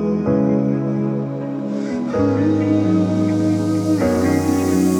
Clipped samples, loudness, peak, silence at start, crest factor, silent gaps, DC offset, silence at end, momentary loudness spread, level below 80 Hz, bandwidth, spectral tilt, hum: under 0.1%; -18 LUFS; -4 dBFS; 0 s; 12 dB; none; under 0.1%; 0 s; 7 LU; -48 dBFS; 19.5 kHz; -7.5 dB/octave; none